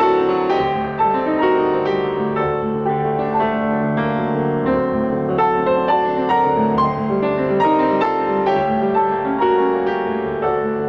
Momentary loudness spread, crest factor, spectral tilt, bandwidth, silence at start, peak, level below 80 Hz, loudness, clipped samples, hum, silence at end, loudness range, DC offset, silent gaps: 4 LU; 10 dB; -8.5 dB/octave; 6.2 kHz; 0 s; -8 dBFS; -46 dBFS; -18 LUFS; under 0.1%; none; 0 s; 2 LU; under 0.1%; none